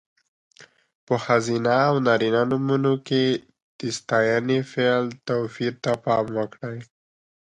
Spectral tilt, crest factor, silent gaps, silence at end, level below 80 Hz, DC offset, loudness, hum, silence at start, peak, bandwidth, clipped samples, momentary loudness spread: -6 dB/octave; 18 dB; 0.95-1.07 s, 3.62-3.79 s; 0.75 s; -64 dBFS; under 0.1%; -23 LUFS; none; 0.6 s; -6 dBFS; 10 kHz; under 0.1%; 10 LU